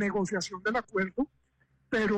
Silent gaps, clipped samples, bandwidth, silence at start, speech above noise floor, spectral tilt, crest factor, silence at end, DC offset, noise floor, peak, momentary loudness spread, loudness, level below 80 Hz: none; under 0.1%; 9.6 kHz; 0 s; 40 dB; -5 dB/octave; 12 dB; 0 s; under 0.1%; -70 dBFS; -20 dBFS; 5 LU; -32 LUFS; -60 dBFS